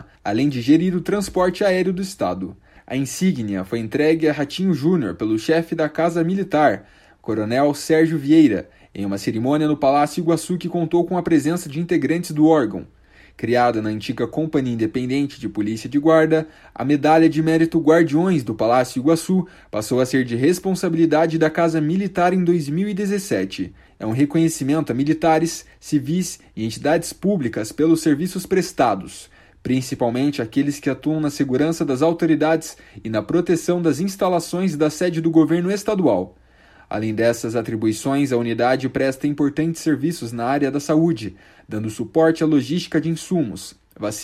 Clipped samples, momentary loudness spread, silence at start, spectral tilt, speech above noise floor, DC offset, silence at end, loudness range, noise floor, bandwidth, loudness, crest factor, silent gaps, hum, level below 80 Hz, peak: under 0.1%; 10 LU; 0 s; -6 dB/octave; 31 dB; under 0.1%; 0 s; 4 LU; -50 dBFS; 14.5 kHz; -20 LUFS; 16 dB; none; none; -52 dBFS; -2 dBFS